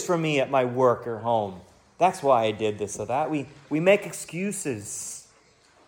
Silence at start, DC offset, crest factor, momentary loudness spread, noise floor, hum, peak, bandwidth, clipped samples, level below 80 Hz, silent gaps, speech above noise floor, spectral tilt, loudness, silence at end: 0 s; under 0.1%; 18 dB; 11 LU; -59 dBFS; none; -8 dBFS; 17.5 kHz; under 0.1%; -66 dBFS; none; 34 dB; -4.5 dB/octave; -25 LUFS; 0.65 s